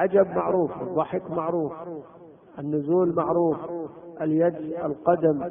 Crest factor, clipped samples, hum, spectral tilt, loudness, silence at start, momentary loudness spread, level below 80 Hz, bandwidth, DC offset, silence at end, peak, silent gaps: 18 dB; under 0.1%; none; -12.5 dB/octave; -25 LUFS; 0 s; 14 LU; -62 dBFS; 3.6 kHz; under 0.1%; 0 s; -6 dBFS; none